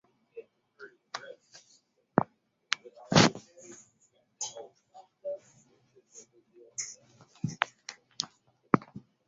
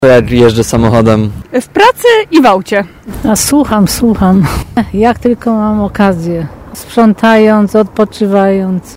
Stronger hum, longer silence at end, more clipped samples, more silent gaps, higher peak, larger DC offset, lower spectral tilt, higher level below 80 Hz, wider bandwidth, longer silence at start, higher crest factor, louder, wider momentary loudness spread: neither; first, 0.5 s vs 0 s; second, under 0.1% vs 1%; neither; about the same, -2 dBFS vs 0 dBFS; neither; second, -3.5 dB/octave vs -5.5 dB/octave; second, -66 dBFS vs -30 dBFS; second, 8 kHz vs 16.5 kHz; first, 0.35 s vs 0 s; first, 32 dB vs 8 dB; second, -32 LUFS vs -9 LUFS; first, 26 LU vs 9 LU